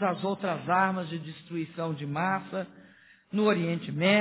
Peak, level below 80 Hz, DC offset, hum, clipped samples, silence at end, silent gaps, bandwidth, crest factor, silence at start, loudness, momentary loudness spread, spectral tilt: -12 dBFS; -72 dBFS; under 0.1%; none; under 0.1%; 0 s; none; 4 kHz; 18 dB; 0 s; -30 LUFS; 11 LU; -4.5 dB/octave